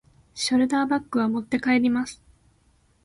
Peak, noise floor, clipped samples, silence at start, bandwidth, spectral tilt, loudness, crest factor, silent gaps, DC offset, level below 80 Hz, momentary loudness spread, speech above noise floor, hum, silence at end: -12 dBFS; -62 dBFS; under 0.1%; 0.35 s; 11.5 kHz; -4 dB/octave; -24 LUFS; 14 dB; none; under 0.1%; -60 dBFS; 8 LU; 39 dB; none; 0.9 s